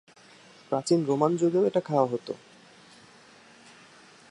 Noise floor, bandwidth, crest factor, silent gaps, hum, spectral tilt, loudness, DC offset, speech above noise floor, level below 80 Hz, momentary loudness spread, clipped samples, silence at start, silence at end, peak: -54 dBFS; 11 kHz; 20 dB; none; none; -6.5 dB/octave; -26 LUFS; under 0.1%; 29 dB; -78 dBFS; 11 LU; under 0.1%; 0.7 s; 1.95 s; -8 dBFS